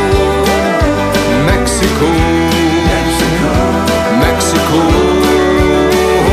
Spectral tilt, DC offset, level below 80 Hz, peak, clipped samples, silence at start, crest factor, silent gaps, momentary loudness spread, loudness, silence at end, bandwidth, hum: -5 dB/octave; under 0.1%; -20 dBFS; 0 dBFS; under 0.1%; 0 s; 10 dB; none; 2 LU; -11 LUFS; 0 s; 15.5 kHz; none